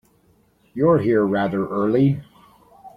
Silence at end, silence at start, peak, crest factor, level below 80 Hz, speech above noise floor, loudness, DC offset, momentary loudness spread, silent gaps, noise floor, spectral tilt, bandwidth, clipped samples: 0.1 s; 0.75 s; -4 dBFS; 16 dB; -56 dBFS; 41 dB; -20 LUFS; under 0.1%; 7 LU; none; -59 dBFS; -10 dB/octave; 5.2 kHz; under 0.1%